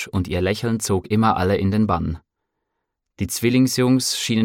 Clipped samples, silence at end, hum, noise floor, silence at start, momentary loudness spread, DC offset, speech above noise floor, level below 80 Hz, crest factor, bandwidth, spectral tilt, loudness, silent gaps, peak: under 0.1%; 0 s; none; -78 dBFS; 0 s; 8 LU; under 0.1%; 59 dB; -44 dBFS; 16 dB; 17.5 kHz; -5 dB/octave; -20 LUFS; none; -4 dBFS